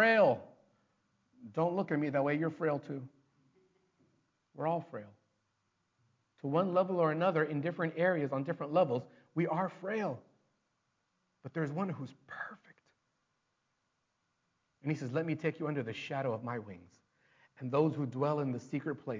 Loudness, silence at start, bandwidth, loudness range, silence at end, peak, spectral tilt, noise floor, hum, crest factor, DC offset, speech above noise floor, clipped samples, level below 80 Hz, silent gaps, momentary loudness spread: -34 LUFS; 0 s; 7.6 kHz; 11 LU; 0 s; -16 dBFS; -8 dB/octave; -82 dBFS; none; 20 dB; under 0.1%; 47 dB; under 0.1%; -80 dBFS; none; 14 LU